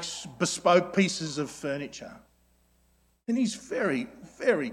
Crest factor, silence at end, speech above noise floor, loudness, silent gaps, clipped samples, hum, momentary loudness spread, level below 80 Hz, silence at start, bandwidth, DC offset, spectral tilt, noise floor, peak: 22 dB; 0 s; 39 dB; -28 LUFS; none; under 0.1%; 60 Hz at -65 dBFS; 18 LU; -66 dBFS; 0 s; 15 kHz; under 0.1%; -4.5 dB/octave; -67 dBFS; -8 dBFS